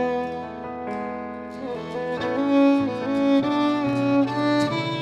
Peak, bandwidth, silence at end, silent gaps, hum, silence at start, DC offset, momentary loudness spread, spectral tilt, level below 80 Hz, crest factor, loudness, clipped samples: -10 dBFS; 9 kHz; 0 s; none; none; 0 s; under 0.1%; 13 LU; -6.5 dB/octave; -58 dBFS; 14 dB; -23 LUFS; under 0.1%